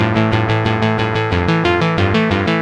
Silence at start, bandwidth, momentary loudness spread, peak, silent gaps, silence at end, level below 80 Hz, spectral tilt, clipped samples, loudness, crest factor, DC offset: 0 s; 8.8 kHz; 2 LU; 0 dBFS; none; 0 s; -38 dBFS; -7 dB/octave; under 0.1%; -15 LUFS; 14 dB; under 0.1%